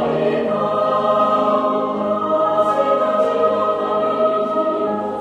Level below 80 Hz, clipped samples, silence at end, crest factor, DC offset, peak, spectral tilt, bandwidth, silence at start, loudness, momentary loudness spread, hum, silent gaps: -58 dBFS; under 0.1%; 0 s; 14 dB; under 0.1%; -4 dBFS; -7 dB/octave; 9.2 kHz; 0 s; -18 LUFS; 4 LU; none; none